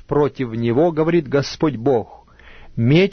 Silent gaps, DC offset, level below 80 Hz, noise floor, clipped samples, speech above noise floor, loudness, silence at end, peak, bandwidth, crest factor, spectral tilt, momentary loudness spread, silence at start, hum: none; under 0.1%; -44 dBFS; -42 dBFS; under 0.1%; 25 dB; -19 LUFS; 0 s; -4 dBFS; 6.6 kHz; 14 dB; -7.5 dB/octave; 6 LU; 0.1 s; none